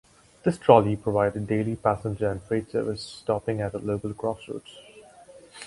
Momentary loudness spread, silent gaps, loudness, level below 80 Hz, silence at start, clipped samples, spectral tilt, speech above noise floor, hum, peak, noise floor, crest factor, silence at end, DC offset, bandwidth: 14 LU; none; -26 LUFS; -52 dBFS; 0.45 s; under 0.1%; -7 dB/octave; 25 dB; none; 0 dBFS; -50 dBFS; 26 dB; 0 s; under 0.1%; 11.5 kHz